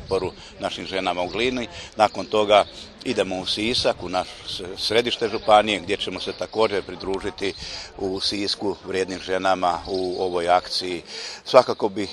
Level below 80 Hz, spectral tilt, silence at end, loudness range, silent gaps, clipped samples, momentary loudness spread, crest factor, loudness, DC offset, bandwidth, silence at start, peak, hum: -50 dBFS; -3.5 dB/octave; 0 s; 3 LU; none; under 0.1%; 12 LU; 22 dB; -23 LUFS; under 0.1%; 12.5 kHz; 0 s; 0 dBFS; none